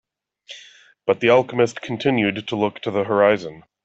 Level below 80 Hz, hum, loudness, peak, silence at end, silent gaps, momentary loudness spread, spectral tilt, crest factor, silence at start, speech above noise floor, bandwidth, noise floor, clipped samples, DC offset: -62 dBFS; none; -20 LUFS; -2 dBFS; 0.25 s; none; 22 LU; -6 dB/octave; 18 dB; 0.5 s; 29 dB; 8 kHz; -48 dBFS; under 0.1%; under 0.1%